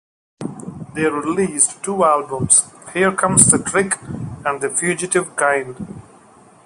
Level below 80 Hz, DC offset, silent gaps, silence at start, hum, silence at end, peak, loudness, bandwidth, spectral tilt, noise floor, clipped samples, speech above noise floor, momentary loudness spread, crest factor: -50 dBFS; under 0.1%; none; 0.4 s; none; 0.65 s; 0 dBFS; -16 LUFS; 16 kHz; -3.5 dB/octave; -47 dBFS; under 0.1%; 30 dB; 19 LU; 20 dB